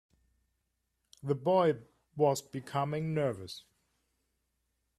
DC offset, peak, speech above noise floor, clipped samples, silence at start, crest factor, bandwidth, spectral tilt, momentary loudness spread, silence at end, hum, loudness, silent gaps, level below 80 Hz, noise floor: under 0.1%; -14 dBFS; 50 dB; under 0.1%; 1.25 s; 20 dB; 14 kHz; -6.5 dB/octave; 17 LU; 1.4 s; none; -32 LUFS; none; -72 dBFS; -81 dBFS